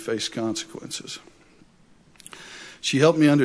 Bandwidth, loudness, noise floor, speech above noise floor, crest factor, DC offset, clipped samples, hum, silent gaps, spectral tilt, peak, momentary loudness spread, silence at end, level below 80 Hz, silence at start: 11 kHz; -23 LUFS; -55 dBFS; 33 dB; 22 dB; under 0.1%; under 0.1%; none; none; -5 dB/octave; -4 dBFS; 23 LU; 0 s; -64 dBFS; 0 s